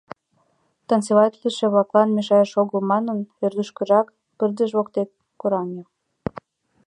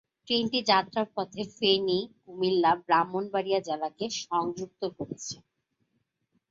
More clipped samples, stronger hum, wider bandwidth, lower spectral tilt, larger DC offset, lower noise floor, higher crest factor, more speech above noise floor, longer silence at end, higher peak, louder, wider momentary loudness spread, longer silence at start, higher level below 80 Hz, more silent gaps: neither; neither; first, 11 kHz vs 7.8 kHz; first, -6.5 dB/octave vs -4 dB/octave; neither; second, -66 dBFS vs -77 dBFS; about the same, 20 dB vs 20 dB; about the same, 46 dB vs 49 dB; about the same, 1.05 s vs 1.15 s; first, -2 dBFS vs -10 dBFS; first, -21 LUFS vs -28 LUFS; about the same, 14 LU vs 12 LU; first, 0.9 s vs 0.25 s; first, -62 dBFS vs -70 dBFS; neither